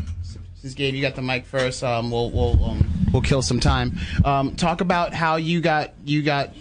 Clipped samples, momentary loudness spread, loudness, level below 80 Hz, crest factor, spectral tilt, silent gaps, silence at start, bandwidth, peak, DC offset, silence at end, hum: under 0.1%; 6 LU; -22 LUFS; -30 dBFS; 18 dB; -5.5 dB/octave; none; 0 s; 10.5 kHz; -4 dBFS; under 0.1%; 0 s; none